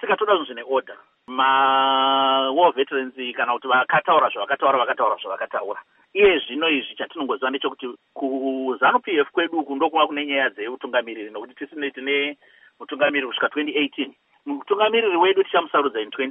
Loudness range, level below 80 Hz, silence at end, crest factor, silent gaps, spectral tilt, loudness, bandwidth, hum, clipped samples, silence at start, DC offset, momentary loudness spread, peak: 5 LU; -64 dBFS; 0 s; 18 dB; none; 0 dB/octave; -21 LUFS; 3.9 kHz; none; under 0.1%; 0 s; under 0.1%; 13 LU; -4 dBFS